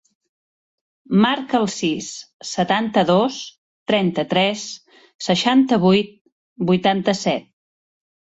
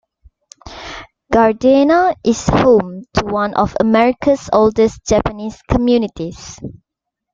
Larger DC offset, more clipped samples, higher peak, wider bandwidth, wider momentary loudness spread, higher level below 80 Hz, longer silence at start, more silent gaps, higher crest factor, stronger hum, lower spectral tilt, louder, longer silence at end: neither; neither; about the same, -2 dBFS vs 0 dBFS; about the same, 8 kHz vs 7.6 kHz; second, 16 LU vs 19 LU; second, -60 dBFS vs -36 dBFS; first, 1.1 s vs 0.65 s; first, 2.34-2.40 s, 3.58-3.86 s, 5.15-5.19 s, 6.21-6.25 s, 6.32-6.56 s vs none; about the same, 18 dB vs 14 dB; neither; about the same, -5 dB/octave vs -6 dB/octave; second, -19 LUFS vs -14 LUFS; first, 0.95 s vs 0.6 s